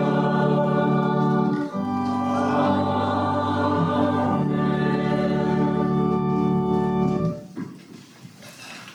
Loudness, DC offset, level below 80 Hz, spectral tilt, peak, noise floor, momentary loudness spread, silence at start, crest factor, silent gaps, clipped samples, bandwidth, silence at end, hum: -22 LUFS; under 0.1%; -50 dBFS; -8 dB/octave; -8 dBFS; -44 dBFS; 7 LU; 0 s; 14 dB; none; under 0.1%; 10.5 kHz; 0 s; none